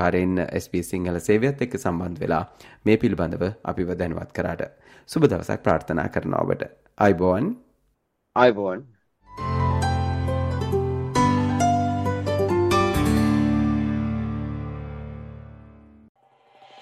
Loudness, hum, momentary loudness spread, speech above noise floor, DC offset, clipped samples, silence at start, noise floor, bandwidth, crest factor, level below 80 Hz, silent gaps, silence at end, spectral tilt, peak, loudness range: -23 LUFS; none; 12 LU; 48 dB; under 0.1%; under 0.1%; 0 s; -71 dBFS; 15.5 kHz; 22 dB; -42 dBFS; 16.09-16.15 s; 0 s; -7 dB/octave; -2 dBFS; 4 LU